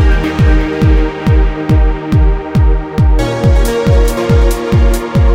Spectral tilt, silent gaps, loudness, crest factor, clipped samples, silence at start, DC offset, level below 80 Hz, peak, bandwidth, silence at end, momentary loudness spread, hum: -7 dB/octave; none; -12 LUFS; 10 dB; under 0.1%; 0 s; under 0.1%; -12 dBFS; 0 dBFS; 16 kHz; 0 s; 2 LU; none